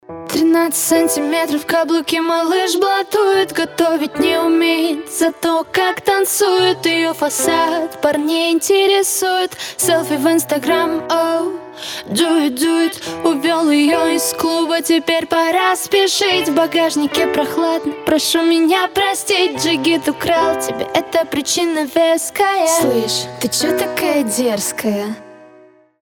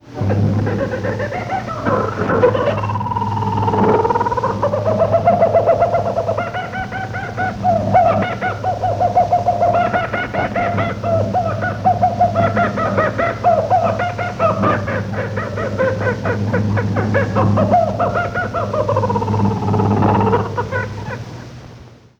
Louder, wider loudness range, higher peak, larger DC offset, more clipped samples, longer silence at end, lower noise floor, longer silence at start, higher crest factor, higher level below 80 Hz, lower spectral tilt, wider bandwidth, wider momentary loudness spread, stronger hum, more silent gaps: about the same, -15 LUFS vs -17 LUFS; about the same, 2 LU vs 2 LU; about the same, 0 dBFS vs -2 dBFS; neither; neither; first, 0.55 s vs 0.25 s; first, -46 dBFS vs -40 dBFS; about the same, 0.1 s vs 0.05 s; about the same, 16 dB vs 16 dB; second, -56 dBFS vs -40 dBFS; second, -2.5 dB/octave vs -7.5 dB/octave; first, 19.5 kHz vs 7.8 kHz; second, 5 LU vs 8 LU; neither; neither